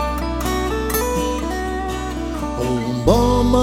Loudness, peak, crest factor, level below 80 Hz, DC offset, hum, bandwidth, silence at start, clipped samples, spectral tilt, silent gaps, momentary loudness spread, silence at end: -20 LUFS; 0 dBFS; 18 dB; -26 dBFS; under 0.1%; none; 16.5 kHz; 0 s; under 0.1%; -5.5 dB/octave; none; 9 LU; 0 s